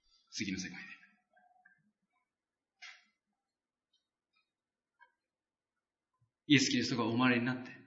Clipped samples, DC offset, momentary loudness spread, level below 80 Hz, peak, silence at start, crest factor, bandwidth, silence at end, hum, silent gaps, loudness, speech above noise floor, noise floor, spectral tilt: under 0.1%; under 0.1%; 25 LU; -80 dBFS; -14 dBFS; 0.35 s; 24 dB; 7.4 kHz; 0.1 s; none; none; -32 LUFS; over 57 dB; under -90 dBFS; -3.5 dB/octave